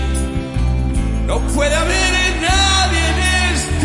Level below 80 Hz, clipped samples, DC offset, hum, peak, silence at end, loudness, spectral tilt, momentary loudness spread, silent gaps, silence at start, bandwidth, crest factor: -20 dBFS; under 0.1%; under 0.1%; none; -2 dBFS; 0 s; -16 LUFS; -3.5 dB/octave; 7 LU; none; 0 s; 11.5 kHz; 14 dB